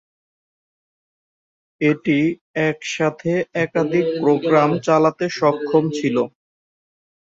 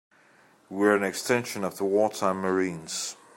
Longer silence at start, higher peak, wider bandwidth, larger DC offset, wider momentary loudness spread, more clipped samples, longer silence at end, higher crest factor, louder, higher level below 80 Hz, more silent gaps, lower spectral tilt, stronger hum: first, 1.8 s vs 0.7 s; first, -2 dBFS vs -8 dBFS; second, 7.8 kHz vs 16.5 kHz; neither; second, 5 LU vs 9 LU; neither; first, 1.1 s vs 0.25 s; about the same, 18 dB vs 20 dB; first, -19 LUFS vs -26 LUFS; first, -62 dBFS vs -74 dBFS; first, 2.41-2.54 s vs none; first, -6.5 dB/octave vs -4 dB/octave; neither